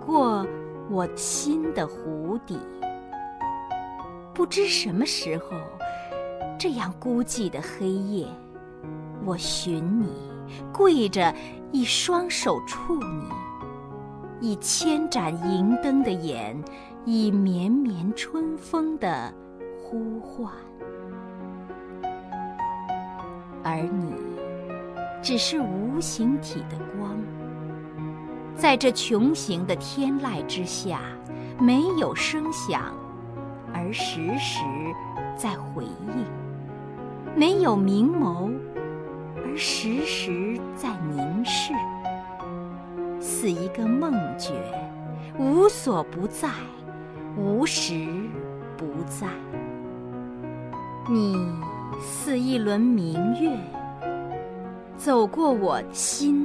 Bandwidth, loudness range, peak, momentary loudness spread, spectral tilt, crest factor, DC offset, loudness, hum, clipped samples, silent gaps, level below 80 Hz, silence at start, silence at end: 11 kHz; 6 LU; -4 dBFS; 15 LU; -4.5 dB/octave; 22 dB; under 0.1%; -26 LUFS; none; under 0.1%; none; -54 dBFS; 0 s; 0 s